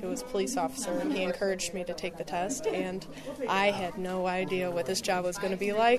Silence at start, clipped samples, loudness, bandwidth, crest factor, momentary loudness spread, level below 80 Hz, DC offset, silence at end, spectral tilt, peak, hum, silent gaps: 0 s; under 0.1%; -31 LUFS; 13.5 kHz; 18 dB; 9 LU; -58 dBFS; under 0.1%; 0 s; -4 dB/octave; -14 dBFS; none; none